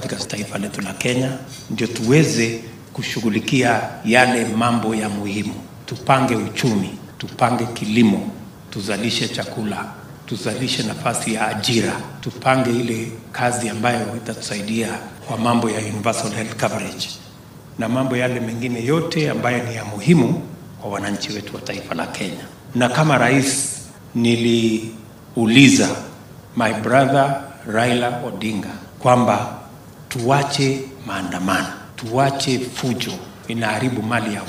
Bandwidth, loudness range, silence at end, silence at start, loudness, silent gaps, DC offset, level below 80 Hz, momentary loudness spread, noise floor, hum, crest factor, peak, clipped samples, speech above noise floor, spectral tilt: 15.5 kHz; 6 LU; 0 s; 0 s; -20 LUFS; none; under 0.1%; -54 dBFS; 14 LU; -40 dBFS; none; 20 dB; 0 dBFS; under 0.1%; 21 dB; -5 dB/octave